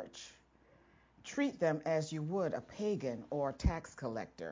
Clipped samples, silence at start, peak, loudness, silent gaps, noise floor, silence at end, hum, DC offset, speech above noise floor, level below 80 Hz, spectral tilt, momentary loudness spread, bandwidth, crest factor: under 0.1%; 0 s; -18 dBFS; -38 LUFS; none; -67 dBFS; 0 s; none; under 0.1%; 30 dB; -48 dBFS; -6 dB/octave; 12 LU; 7.6 kHz; 20 dB